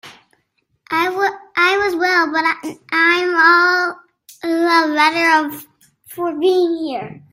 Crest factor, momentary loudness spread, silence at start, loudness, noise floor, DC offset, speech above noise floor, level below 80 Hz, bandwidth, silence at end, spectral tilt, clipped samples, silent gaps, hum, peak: 18 dB; 13 LU; 0.05 s; -15 LUFS; -66 dBFS; under 0.1%; 51 dB; -64 dBFS; 16 kHz; 0.15 s; -3 dB/octave; under 0.1%; none; none; 0 dBFS